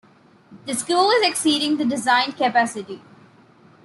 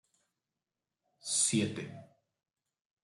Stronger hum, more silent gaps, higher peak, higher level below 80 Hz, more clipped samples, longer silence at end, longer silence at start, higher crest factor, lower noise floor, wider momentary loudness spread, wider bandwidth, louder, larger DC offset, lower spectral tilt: neither; neither; first, -6 dBFS vs -18 dBFS; first, -72 dBFS vs -78 dBFS; neither; about the same, 0.9 s vs 1 s; second, 0.5 s vs 1.25 s; second, 16 dB vs 22 dB; second, -51 dBFS vs under -90 dBFS; about the same, 18 LU vs 18 LU; about the same, 12.5 kHz vs 11.5 kHz; first, -19 LUFS vs -31 LUFS; neither; about the same, -2 dB/octave vs -3 dB/octave